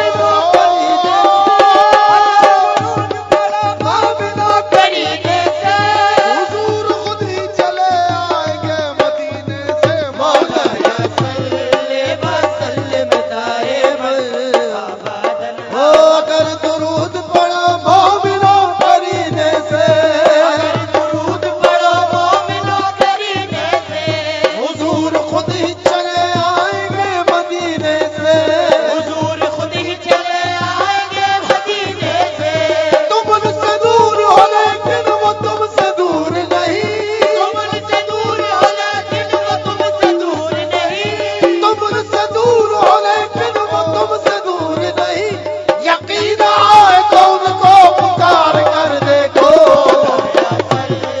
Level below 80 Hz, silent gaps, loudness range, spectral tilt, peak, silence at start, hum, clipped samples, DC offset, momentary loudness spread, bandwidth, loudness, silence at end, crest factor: -54 dBFS; none; 6 LU; -4.5 dB/octave; 0 dBFS; 0 s; none; 0.5%; under 0.1%; 9 LU; 11 kHz; -12 LUFS; 0 s; 12 dB